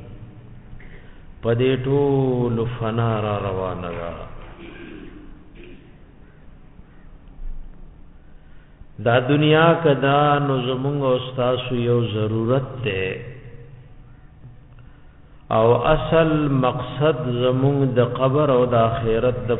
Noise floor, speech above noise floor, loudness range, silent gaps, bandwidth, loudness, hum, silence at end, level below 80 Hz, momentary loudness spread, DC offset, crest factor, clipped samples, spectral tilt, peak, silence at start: -45 dBFS; 26 dB; 10 LU; none; 4 kHz; -20 LUFS; none; 0 s; -40 dBFS; 22 LU; 0.1%; 18 dB; under 0.1%; -12 dB/octave; -2 dBFS; 0 s